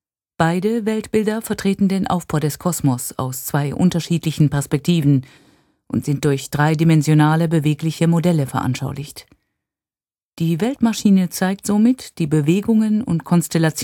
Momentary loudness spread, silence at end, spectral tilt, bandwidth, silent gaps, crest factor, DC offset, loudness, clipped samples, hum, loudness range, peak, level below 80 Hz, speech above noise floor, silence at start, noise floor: 7 LU; 0 s; -6.5 dB/octave; 17.5 kHz; 10.23-10.32 s; 18 dB; under 0.1%; -18 LUFS; under 0.1%; none; 4 LU; 0 dBFS; -50 dBFS; over 72 dB; 0.4 s; under -90 dBFS